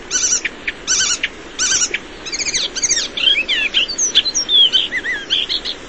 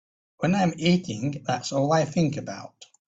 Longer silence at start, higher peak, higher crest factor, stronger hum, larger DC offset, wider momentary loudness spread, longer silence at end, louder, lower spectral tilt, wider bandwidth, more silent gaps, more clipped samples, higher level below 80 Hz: second, 0 s vs 0.4 s; first, -2 dBFS vs -10 dBFS; about the same, 16 dB vs 16 dB; neither; first, 0.6% vs under 0.1%; second, 9 LU vs 13 LU; second, 0 s vs 0.25 s; first, -15 LUFS vs -25 LUFS; second, 1.5 dB/octave vs -6 dB/octave; about the same, 8.8 kHz vs 8 kHz; neither; neither; first, -44 dBFS vs -60 dBFS